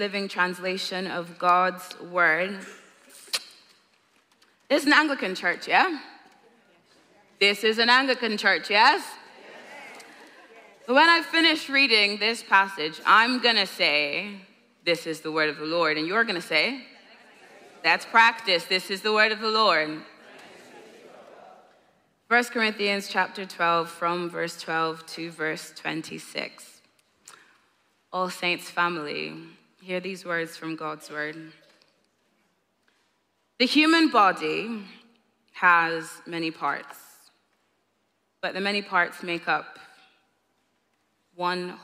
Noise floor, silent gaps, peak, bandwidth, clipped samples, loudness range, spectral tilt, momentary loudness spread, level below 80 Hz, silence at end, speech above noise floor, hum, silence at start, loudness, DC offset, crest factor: -73 dBFS; none; -4 dBFS; 16 kHz; under 0.1%; 10 LU; -3 dB/octave; 16 LU; -84 dBFS; 0.05 s; 48 dB; none; 0 s; -23 LUFS; under 0.1%; 22 dB